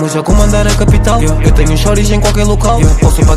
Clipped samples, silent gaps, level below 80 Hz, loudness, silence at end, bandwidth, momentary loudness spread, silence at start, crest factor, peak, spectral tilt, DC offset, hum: 0.8%; none; -10 dBFS; -10 LUFS; 0 s; 14 kHz; 2 LU; 0 s; 8 dB; 0 dBFS; -5.5 dB/octave; under 0.1%; none